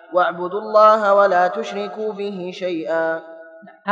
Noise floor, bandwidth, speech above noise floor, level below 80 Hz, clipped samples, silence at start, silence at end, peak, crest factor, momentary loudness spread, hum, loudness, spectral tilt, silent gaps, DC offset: -42 dBFS; 7.6 kHz; 24 dB; -82 dBFS; under 0.1%; 0.1 s; 0 s; -2 dBFS; 16 dB; 14 LU; none; -18 LUFS; -5.5 dB/octave; none; under 0.1%